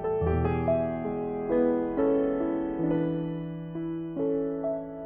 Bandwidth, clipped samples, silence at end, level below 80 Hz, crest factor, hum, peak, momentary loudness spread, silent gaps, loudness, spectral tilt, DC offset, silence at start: 3.6 kHz; under 0.1%; 0 s; -46 dBFS; 14 dB; none; -14 dBFS; 8 LU; none; -29 LUFS; -12.5 dB/octave; under 0.1%; 0 s